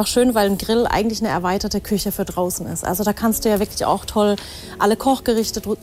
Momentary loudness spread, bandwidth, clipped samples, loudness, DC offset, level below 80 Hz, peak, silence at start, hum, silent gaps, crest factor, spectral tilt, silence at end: 6 LU; 16 kHz; under 0.1%; -20 LUFS; under 0.1%; -40 dBFS; -4 dBFS; 0 s; none; none; 14 dB; -4.5 dB/octave; 0 s